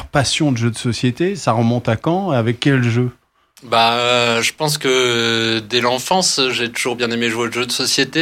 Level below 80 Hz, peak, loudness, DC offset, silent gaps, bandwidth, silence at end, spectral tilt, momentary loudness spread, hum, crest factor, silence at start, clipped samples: -48 dBFS; -2 dBFS; -16 LUFS; under 0.1%; none; 16 kHz; 0 s; -4 dB/octave; 5 LU; none; 16 dB; 0 s; under 0.1%